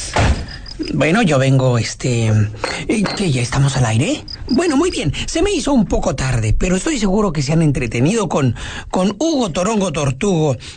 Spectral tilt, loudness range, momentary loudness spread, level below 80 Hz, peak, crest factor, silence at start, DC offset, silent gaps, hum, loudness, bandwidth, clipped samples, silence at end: -5.5 dB/octave; 1 LU; 6 LU; -28 dBFS; -4 dBFS; 12 dB; 0 s; under 0.1%; none; none; -17 LUFS; 9.4 kHz; under 0.1%; 0 s